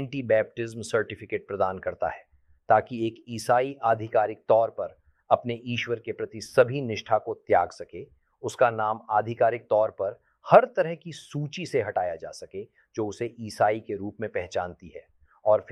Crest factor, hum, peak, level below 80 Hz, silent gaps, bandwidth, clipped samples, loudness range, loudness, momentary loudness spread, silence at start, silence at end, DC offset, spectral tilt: 24 dB; none; -2 dBFS; -64 dBFS; none; 12.5 kHz; under 0.1%; 6 LU; -26 LUFS; 14 LU; 0 s; 0 s; under 0.1%; -5.5 dB/octave